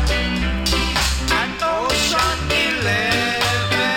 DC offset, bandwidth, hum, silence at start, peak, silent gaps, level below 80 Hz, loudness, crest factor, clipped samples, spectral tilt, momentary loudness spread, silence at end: under 0.1%; 17 kHz; none; 0 s; -4 dBFS; none; -26 dBFS; -18 LUFS; 14 dB; under 0.1%; -3.5 dB/octave; 3 LU; 0 s